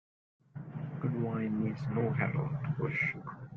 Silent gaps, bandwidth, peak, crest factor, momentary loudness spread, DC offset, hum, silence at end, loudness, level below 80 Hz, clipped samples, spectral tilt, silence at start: none; 6.4 kHz; -16 dBFS; 18 dB; 12 LU; under 0.1%; none; 0 s; -34 LUFS; -64 dBFS; under 0.1%; -9.5 dB/octave; 0.55 s